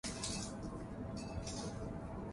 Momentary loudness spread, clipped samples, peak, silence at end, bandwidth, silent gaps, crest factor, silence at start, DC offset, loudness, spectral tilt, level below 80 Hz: 5 LU; under 0.1%; -26 dBFS; 0 s; 11.5 kHz; none; 18 dB; 0.05 s; under 0.1%; -44 LUFS; -4.5 dB/octave; -52 dBFS